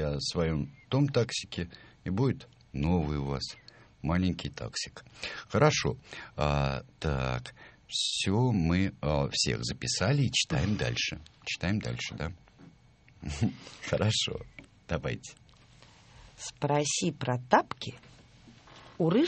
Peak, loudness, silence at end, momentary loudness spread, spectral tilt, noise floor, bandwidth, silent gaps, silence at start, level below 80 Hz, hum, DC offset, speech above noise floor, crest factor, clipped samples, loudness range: -6 dBFS; -31 LUFS; 0 s; 14 LU; -4.5 dB/octave; -59 dBFS; 8.8 kHz; none; 0 s; -48 dBFS; none; under 0.1%; 29 dB; 24 dB; under 0.1%; 5 LU